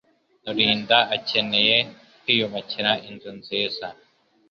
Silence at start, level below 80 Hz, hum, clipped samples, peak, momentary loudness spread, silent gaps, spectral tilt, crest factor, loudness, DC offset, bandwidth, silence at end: 0.45 s; -64 dBFS; none; under 0.1%; -2 dBFS; 17 LU; none; -5 dB/octave; 22 dB; -21 LUFS; under 0.1%; 7 kHz; 0.55 s